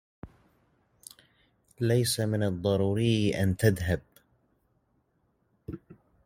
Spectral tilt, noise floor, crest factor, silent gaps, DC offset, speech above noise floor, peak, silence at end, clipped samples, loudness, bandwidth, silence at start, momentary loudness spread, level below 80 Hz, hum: -6 dB/octave; -72 dBFS; 22 dB; none; under 0.1%; 46 dB; -8 dBFS; 0.3 s; under 0.1%; -27 LUFS; 16.5 kHz; 0.25 s; 22 LU; -56 dBFS; none